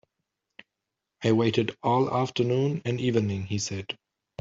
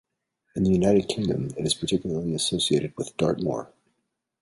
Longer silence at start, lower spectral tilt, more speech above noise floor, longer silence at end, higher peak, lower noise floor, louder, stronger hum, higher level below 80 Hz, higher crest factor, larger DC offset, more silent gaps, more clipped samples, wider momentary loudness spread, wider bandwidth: first, 1.2 s vs 0.55 s; about the same, -6 dB/octave vs -5 dB/octave; first, 60 dB vs 53 dB; second, 0.45 s vs 0.75 s; about the same, -8 dBFS vs -8 dBFS; first, -85 dBFS vs -78 dBFS; about the same, -26 LUFS vs -25 LUFS; neither; second, -64 dBFS vs -50 dBFS; about the same, 20 dB vs 18 dB; neither; neither; neither; first, 11 LU vs 8 LU; second, 7.8 kHz vs 11.5 kHz